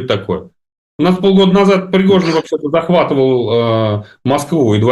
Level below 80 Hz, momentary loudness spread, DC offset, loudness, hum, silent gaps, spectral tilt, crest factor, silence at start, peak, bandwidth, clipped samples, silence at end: -48 dBFS; 8 LU; under 0.1%; -13 LUFS; none; 0.78-0.99 s; -7 dB/octave; 10 dB; 0 s; -2 dBFS; 12 kHz; under 0.1%; 0 s